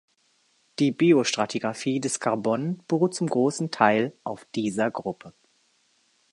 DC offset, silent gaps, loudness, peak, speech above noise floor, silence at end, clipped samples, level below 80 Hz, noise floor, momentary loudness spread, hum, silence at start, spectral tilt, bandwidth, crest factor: under 0.1%; none; -25 LUFS; -4 dBFS; 42 dB; 1.05 s; under 0.1%; -72 dBFS; -67 dBFS; 12 LU; none; 0.8 s; -5 dB/octave; 11.5 kHz; 22 dB